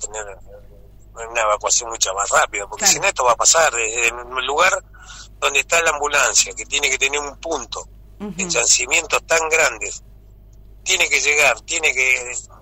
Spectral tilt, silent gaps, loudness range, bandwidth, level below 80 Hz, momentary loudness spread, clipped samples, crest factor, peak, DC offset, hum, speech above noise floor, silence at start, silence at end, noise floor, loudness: 0.5 dB/octave; none; 2 LU; 16 kHz; -44 dBFS; 14 LU; under 0.1%; 16 dB; -4 dBFS; under 0.1%; none; 25 dB; 0 s; 0.05 s; -44 dBFS; -16 LUFS